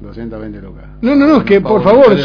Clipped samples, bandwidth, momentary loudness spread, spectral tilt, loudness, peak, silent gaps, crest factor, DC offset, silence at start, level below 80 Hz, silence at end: 0.7%; 5.4 kHz; 20 LU; -8.5 dB/octave; -9 LUFS; 0 dBFS; none; 10 dB; under 0.1%; 0 s; -34 dBFS; 0 s